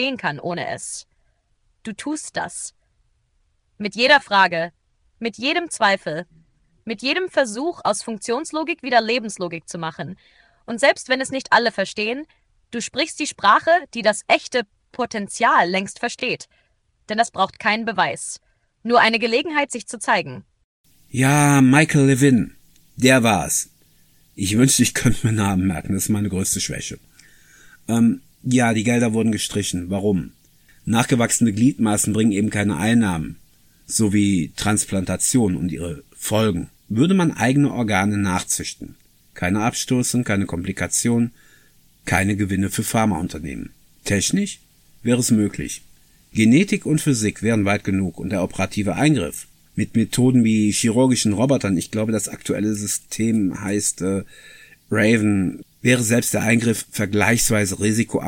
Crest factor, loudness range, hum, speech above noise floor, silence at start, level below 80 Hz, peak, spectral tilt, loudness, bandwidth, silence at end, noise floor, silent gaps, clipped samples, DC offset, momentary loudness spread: 18 dB; 5 LU; none; 45 dB; 0 s; -48 dBFS; -2 dBFS; -4.5 dB/octave; -20 LUFS; 17 kHz; 0 s; -65 dBFS; 20.64-20.84 s; under 0.1%; under 0.1%; 14 LU